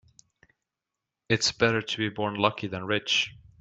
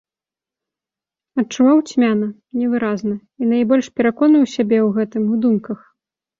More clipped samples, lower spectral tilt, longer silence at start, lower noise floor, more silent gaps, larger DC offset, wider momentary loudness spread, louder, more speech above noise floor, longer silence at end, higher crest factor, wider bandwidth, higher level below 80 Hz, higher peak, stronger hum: neither; second, -3.5 dB/octave vs -6.5 dB/octave; about the same, 1.3 s vs 1.35 s; about the same, -87 dBFS vs -89 dBFS; neither; neither; second, 6 LU vs 10 LU; second, -26 LUFS vs -17 LUFS; second, 60 dB vs 73 dB; second, 0.3 s vs 0.65 s; first, 24 dB vs 14 dB; first, 9.8 kHz vs 7.6 kHz; about the same, -62 dBFS vs -62 dBFS; about the same, -4 dBFS vs -4 dBFS; neither